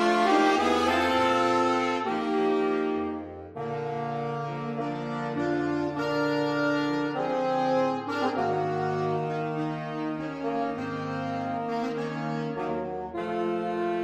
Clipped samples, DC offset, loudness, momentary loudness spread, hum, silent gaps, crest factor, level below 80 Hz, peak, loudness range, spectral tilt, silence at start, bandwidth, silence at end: under 0.1%; under 0.1%; -28 LUFS; 9 LU; none; none; 18 dB; -64 dBFS; -10 dBFS; 5 LU; -6 dB/octave; 0 s; 13.5 kHz; 0 s